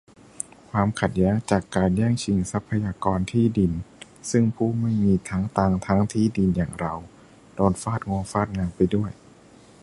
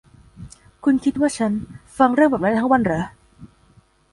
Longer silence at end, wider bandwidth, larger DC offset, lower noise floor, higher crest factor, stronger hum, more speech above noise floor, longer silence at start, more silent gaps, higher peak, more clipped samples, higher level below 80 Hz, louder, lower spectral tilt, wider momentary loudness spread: about the same, 0.7 s vs 0.65 s; about the same, 11.5 kHz vs 11.5 kHz; neither; second, -50 dBFS vs -55 dBFS; about the same, 20 dB vs 18 dB; neither; second, 28 dB vs 37 dB; first, 0.75 s vs 0.4 s; neither; about the same, -4 dBFS vs -2 dBFS; neither; first, -42 dBFS vs -50 dBFS; second, -24 LUFS vs -19 LUFS; about the same, -7 dB/octave vs -6 dB/octave; about the same, 10 LU vs 11 LU